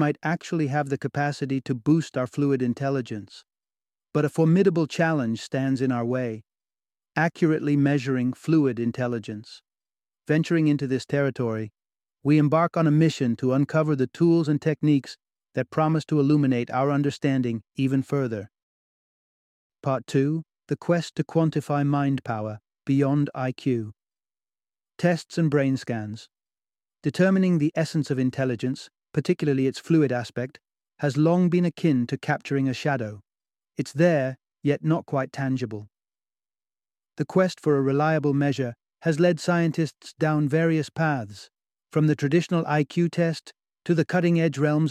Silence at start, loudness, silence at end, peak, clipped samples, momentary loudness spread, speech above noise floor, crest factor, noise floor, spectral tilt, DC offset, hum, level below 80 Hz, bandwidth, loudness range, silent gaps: 0 s; -24 LUFS; 0 s; -6 dBFS; under 0.1%; 10 LU; over 67 dB; 18 dB; under -90 dBFS; -7.5 dB/octave; under 0.1%; none; -66 dBFS; 11.5 kHz; 4 LU; 18.63-19.70 s